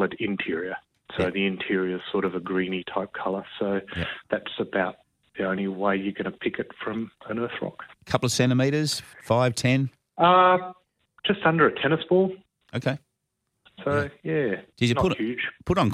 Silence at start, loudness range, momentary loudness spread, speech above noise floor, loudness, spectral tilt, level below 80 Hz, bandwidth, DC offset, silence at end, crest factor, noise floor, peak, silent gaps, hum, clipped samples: 0 s; 7 LU; 11 LU; 54 dB; -25 LUFS; -5.5 dB/octave; -54 dBFS; 15 kHz; under 0.1%; 0 s; 20 dB; -79 dBFS; -6 dBFS; none; none; under 0.1%